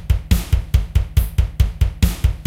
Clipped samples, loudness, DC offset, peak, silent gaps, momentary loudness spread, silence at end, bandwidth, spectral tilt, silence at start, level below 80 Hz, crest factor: under 0.1%; -20 LUFS; under 0.1%; 0 dBFS; none; 1 LU; 0.05 s; 16.5 kHz; -6 dB/octave; 0 s; -18 dBFS; 16 dB